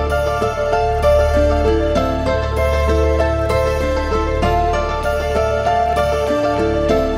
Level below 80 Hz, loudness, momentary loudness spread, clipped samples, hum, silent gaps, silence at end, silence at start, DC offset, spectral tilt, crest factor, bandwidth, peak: -24 dBFS; -17 LUFS; 4 LU; under 0.1%; none; none; 0 s; 0 s; under 0.1%; -6.5 dB/octave; 12 dB; 15.5 kHz; -4 dBFS